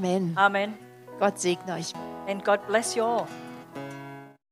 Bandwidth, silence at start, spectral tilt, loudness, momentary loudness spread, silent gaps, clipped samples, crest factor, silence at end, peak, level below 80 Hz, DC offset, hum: 15.5 kHz; 0 s; -4 dB/octave; -27 LUFS; 19 LU; none; under 0.1%; 22 dB; 0.2 s; -6 dBFS; -76 dBFS; under 0.1%; none